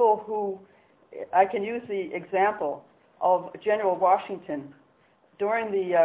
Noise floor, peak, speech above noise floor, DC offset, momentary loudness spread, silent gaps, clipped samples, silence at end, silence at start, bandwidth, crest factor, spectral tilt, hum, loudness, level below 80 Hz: -62 dBFS; -8 dBFS; 37 dB; under 0.1%; 13 LU; none; under 0.1%; 0 s; 0 s; 4 kHz; 18 dB; -9 dB/octave; none; -26 LUFS; -72 dBFS